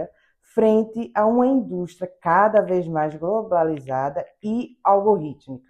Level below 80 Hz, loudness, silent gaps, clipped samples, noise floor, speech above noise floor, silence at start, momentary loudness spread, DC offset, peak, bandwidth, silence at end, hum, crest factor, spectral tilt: -62 dBFS; -21 LUFS; none; under 0.1%; -48 dBFS; 27 dB; 0 s; 11 LU; under 0.1%; -4 dBFS; 9.6 kHz; 0.1 s; none; 18 dB; -8.5 dB/octave